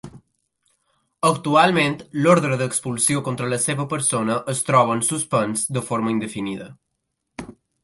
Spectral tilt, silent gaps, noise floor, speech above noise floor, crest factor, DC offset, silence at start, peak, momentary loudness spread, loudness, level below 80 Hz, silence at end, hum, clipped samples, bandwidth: -4 dB/octave; none; -77 dBFS; 56 dB; 20 dB; under 0.1%; 0.05 s; -2 dBFS; 12 LU; -20 LUFS; -60 dBFS; 0.3 s; none; under 0.1%; 12 kHz